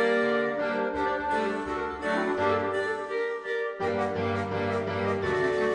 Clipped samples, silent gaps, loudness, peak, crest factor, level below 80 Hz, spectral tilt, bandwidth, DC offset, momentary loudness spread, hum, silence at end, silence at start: under 0.1%; none; -28 LUFS; -12 dBFS; 14 dB; -56 dBFS; -6 dB/octave; 10 kHz; under 0.1%; 5 LU; none; 0 s; 0 s